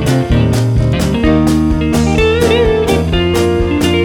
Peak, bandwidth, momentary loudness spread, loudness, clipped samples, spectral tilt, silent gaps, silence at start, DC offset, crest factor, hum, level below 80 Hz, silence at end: 0 dBFS; 18 kHz; 2 LU; -12 LUFS; under 0.1%; -6.5 dB/octave; none; 0 s; under 0.1%; 10 dB; none; -20 dBFS; 0 s